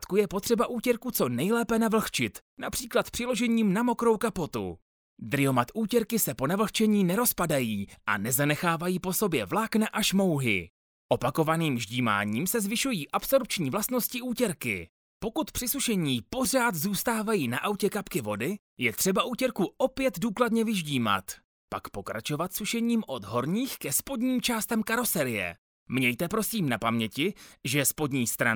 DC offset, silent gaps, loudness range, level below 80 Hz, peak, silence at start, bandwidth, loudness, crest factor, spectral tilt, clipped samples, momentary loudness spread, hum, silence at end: under 0.1%; 2.41-2.57 s, 4.82-5.17 s, 10.70-11.09 s, 14.89-15.20 s, 18.59-18.76 s, 21.44-21.68 s, 25.58-25.86 s; 3 LU; -56 dBFS; -10 dBFS; 0 s; over 20 kHz; -28 LUFS; 18 dB; -4 dB/octave; under 0.1%; 7 LU; none; 0 s